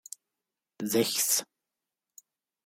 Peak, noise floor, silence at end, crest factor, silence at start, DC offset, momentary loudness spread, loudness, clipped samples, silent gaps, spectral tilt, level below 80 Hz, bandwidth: -12 dBFS; -88 dBFS; 1.2 s; 22 dB; 0.8 s; under 0.1%; 21 LU; -27 LUFS; under 0.1%; none; -2 dB/octave; -78 dBFS; 17 kHz